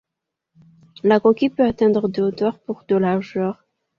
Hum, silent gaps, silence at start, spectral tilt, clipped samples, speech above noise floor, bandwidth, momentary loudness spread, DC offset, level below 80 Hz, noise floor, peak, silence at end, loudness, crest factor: none; none; 1.05 s; -8.5 dB/octave; under 0.1%; 64 dB; 6.8 kHz; 9 LU; under 0.1%; -56 dBFS; -83 dBFS; -2 dBFS; 0.45 s; -19 LUFS; 18 dB